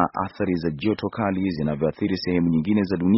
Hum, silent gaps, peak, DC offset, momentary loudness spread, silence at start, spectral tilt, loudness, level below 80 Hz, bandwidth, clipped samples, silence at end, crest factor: none; none; -4 dBFS; under 0.1%; 4 LU; 0 s; -6.5 dB/octave; -24 LUFS; -50 dBFS; 5.8 kHz; under 0.1%; 0 s; 18 dB